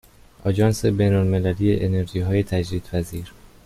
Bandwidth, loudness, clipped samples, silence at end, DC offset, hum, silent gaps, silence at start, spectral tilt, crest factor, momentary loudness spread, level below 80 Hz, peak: 14.5 kHz; -22 LUFS; under 0.1%; 0.35 s; under 0.1%; none; none; 0.45 s; -7.5 dB/octave; 16 dB; 10 LU; -42 dBFS; -6 dBFS